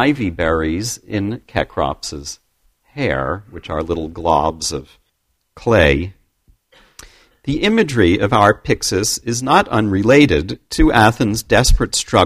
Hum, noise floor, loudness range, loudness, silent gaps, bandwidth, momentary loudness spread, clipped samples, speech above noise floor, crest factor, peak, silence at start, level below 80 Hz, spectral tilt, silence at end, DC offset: none; -67 dBFS; 8 LU; -16 LUFS; none; 15.5 kHz; 13 LU; under 0.1%; 52 dB; 16 dB; 0 dBFS; 0 s; -28 dBFS; -4.5 dB/octave; 0 s; under 0.1%